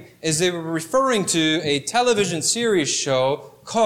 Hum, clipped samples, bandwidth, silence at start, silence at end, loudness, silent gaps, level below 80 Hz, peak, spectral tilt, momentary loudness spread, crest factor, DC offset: none; under 0.1%; 16.5 kHz; 0 s; 0 s; -20 LUFS; none; -60 dBFS; -6 dBFS; -3 dB/octave; 5 LU; 14 dB; under 0.1%